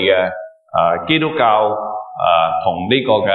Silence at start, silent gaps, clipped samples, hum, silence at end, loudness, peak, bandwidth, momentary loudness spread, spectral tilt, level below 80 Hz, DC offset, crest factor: 0 s; none; under 0.1%; none; 0 s; -16 LUFS; 0 dBFS; 4.4 kHz; 9 LU; -8.5 dB/octave; -54 dBFS; under 0.1%; 14 dB